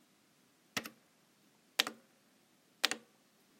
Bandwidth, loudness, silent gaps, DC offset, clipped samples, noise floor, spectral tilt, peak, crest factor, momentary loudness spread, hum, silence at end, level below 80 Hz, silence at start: 16.5 kHz; -37 LUFS; none; under 0.1%; under 0.1%; -70 dBFS; 0 dB/octave; -6 dBFS; 38 dB; 9 LU; none; 0.6 s; -90 dBFS; 0.75 s